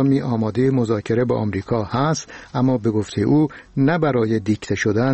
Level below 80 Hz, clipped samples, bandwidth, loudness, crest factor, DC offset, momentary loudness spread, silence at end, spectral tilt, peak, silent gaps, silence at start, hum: -50 dBFS; under 0.1%; 8.4 kHz; -20 LUFS; 14 dB; 0.1%; 5 LU; 0 s; -7 dB/octave; -6 dBFS; none; 0 s; none